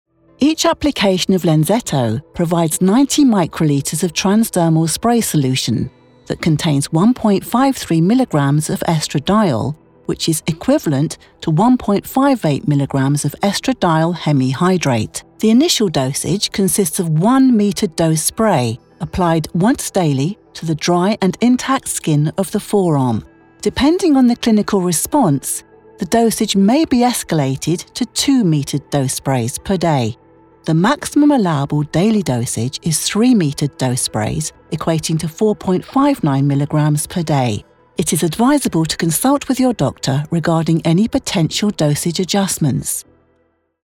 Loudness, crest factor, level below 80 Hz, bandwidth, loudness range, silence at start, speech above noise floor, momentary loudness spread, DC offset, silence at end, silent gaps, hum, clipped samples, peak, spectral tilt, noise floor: -16 LUFS; 12 dB; -44 dBFS; 17.5 kHz; 2 LU; 0.4 s; 46 dB; 7 LU; under 0.1%; 0.85 s; none; none; under 0.1%; -2 dBFS; -5 dB/octave; -61 dBFS